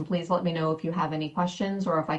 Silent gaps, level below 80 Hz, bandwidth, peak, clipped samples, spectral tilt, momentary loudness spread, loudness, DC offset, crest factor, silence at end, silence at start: none; -64 dBFS; 8.4 kHz; -12 dBFS; under 0.1%; -7 dB/octave; 3 LU; -28 LUFS; under 0.1%; 16 dB; 0 s; 0 s